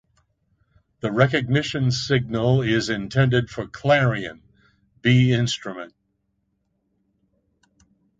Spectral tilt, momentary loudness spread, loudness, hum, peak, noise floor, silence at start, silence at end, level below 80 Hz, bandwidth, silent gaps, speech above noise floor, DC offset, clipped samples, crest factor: -6 dB/octave; 13 LU; -21 LUFS; none; -2 dBFS; -72 dBFS; 1.05 s; 2.3 s; -52 dBFS; 7.8 kHz; none; 51 dB; under 0.1%; under 0.1%; 22 dB